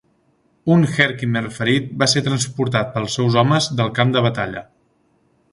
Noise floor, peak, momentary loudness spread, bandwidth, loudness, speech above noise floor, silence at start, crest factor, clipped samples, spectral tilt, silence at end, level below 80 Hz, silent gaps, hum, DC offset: -61 dBFS; 0 dBFS; 7 LU; 11.5 kHz; -18 LUFS; 43 dB; 0.65 s; 18 dB; under 0.1%; -5 dB/octave; 0.9 s; -54 dBFS; none; none; under 0.1%